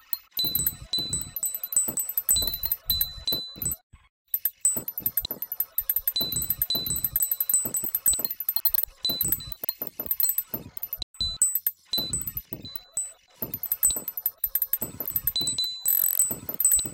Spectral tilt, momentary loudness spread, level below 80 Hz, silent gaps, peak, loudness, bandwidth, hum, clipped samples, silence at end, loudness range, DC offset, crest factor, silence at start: -0.5 dB/octave; 10 LU; -50 dBFS; 3.83-3.90 s, 4.09-4.25 s, 11.03-11.14 s; -8 dBFS; -25 LUFS; 17.5 kHz; none; under 0.1%; 0 s; 3 LU; under 0.1%; 20 dB; 0.1 s